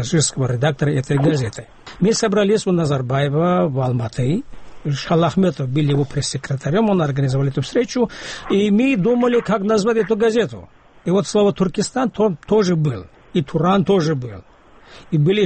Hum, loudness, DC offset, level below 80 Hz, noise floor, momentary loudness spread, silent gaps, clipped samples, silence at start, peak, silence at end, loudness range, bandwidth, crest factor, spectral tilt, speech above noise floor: none; -18 LUFS; under 0.1%; -46 dBFS; -44 dBFS; 8 LU; none; under 0.1%; 0 s; -4 dBFS; 0 s; 2 LU; 8.8 kHz; 14 dB; -6 dB/octave; 27 dB